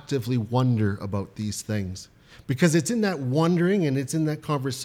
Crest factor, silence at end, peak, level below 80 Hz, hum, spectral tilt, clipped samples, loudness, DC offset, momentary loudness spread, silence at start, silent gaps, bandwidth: 18 dB; 0 s; -8 dBFS; -58 dBFS; none; -6 dB/octave; under 0.1%; -25 LUFS; under 0.1%; 10 LU; 0.1 s; none; 16.5 kHz